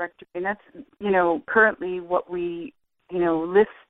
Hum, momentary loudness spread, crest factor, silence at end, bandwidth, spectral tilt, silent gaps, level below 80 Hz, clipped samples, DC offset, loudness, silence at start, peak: none; 14 LU; 20 dB; 0.2 s; 4 kHz; -9 dB/octave; none; -60 dBFS; under 0.1%; under 0.1%; -23 LUFS; 0 s; -4 dBFS